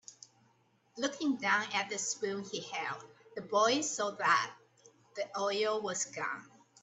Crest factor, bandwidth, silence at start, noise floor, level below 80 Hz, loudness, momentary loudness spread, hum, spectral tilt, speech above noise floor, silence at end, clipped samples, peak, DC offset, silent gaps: 22 dB; 8.6 kHz; 0.1 s; -70 dBFS; -84 dBFS; -33 LUFS; 16 LU; none; -2 dB/octave; 37 dB; 0.35 s; under 0.1%; -14 dBFS; under 0.1%; none